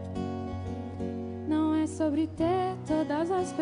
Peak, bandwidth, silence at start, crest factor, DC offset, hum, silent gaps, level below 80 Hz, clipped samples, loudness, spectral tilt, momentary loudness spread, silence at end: -16 dBFS; 10.5 kHz; 0 s; 14 dB; under 0.1%; none; none; -56 dBFS; under 0.1%; -30 LUFS; -7 dB/octave; 8 LU; 0 s